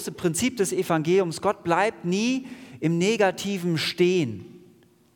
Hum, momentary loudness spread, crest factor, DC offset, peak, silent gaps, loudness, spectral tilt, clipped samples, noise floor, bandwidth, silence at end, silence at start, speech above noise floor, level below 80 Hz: none; 7 LU; 16 dB; under 0.1%; -8 dBFS; none; -24 LUFS; -5 dB/octave; under 0.1%; -56 dBFS; 18 kHz; 0.6 s; 0 s; 32 dB; -66 dBFS